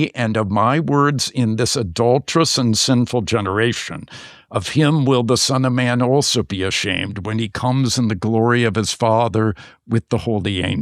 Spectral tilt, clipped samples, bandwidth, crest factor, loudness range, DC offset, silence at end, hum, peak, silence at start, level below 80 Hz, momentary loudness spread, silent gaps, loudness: -5 dB/octave; under 0.1%; 14.5 kHz; 14 dB; 2 LU; under 0.1%; 0 s; none; -4 dBFS; 0 s; -48 dBFS; 7 LU; none; -18 LUFS